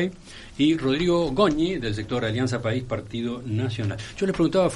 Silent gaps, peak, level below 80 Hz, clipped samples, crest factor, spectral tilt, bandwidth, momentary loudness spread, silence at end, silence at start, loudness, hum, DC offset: none; -6 dBFS; -46 dBFS; under 0.1%; 18 dB; -6.5 dB/octave; 11.5 kHz; 9 LU; 0 s; 0 s; -25 LUFS; none; under 0.1%